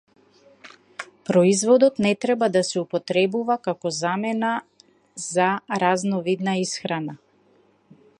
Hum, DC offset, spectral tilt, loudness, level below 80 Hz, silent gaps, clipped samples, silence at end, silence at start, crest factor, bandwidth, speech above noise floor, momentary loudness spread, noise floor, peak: none; under 0.1%; -4.5 dB/octave; -22 LUFS; -70 dBFS; none; under 0.1%; 1.05 s; 0.65 s; 18 dB; 11.5 kHz; 38 dB; 16 LU; -60 dBFS; -4 dBFS